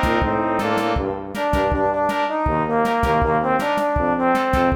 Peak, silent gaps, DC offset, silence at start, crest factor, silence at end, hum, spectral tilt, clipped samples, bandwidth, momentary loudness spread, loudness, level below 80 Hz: -6 dBFS; none; under 0.1%; 0 s; 14 dB; 0 s; none; -6.5 dB/octave; under 0.1%; over 20 kHz; 3 LU; -20 LUFS; -32 dBFS